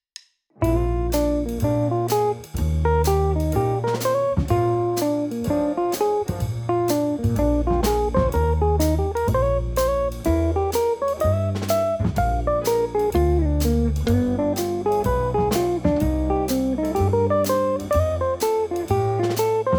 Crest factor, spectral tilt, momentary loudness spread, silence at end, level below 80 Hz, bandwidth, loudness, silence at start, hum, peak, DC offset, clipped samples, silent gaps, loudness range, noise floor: 14 dB; -7 dB/octave; 3 LU; 0 s; -28 dBFS; over 20 kHz; -22 LUFS; 0.6 s; none; -6 dBFS; under 0.1%; under 0.1%; none; 1 LU; -47 dBFS